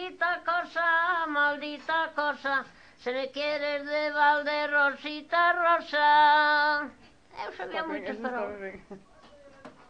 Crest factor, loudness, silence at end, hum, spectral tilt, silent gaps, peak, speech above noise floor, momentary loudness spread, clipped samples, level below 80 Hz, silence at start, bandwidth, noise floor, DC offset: 16 dB; -26 LUFS; 0.2 s; none; -3.5 dB/octave; none; -12 dBFS; 27 dB; 15 LU; under 0.1%; -68 dBFS; 0 s; 8.2 kHz; -54 dBFS; under 0.1%